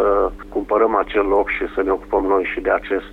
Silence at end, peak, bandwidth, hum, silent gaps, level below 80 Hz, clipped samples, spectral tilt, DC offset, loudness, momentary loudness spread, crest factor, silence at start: 0 s; -4 dBFS; 4.8 kHz; none; none; -38 dBFS; under 0.1%; -7 dB/octave; under 0.1%; -19 LUFS; 4 LU; 14 dB; 0 s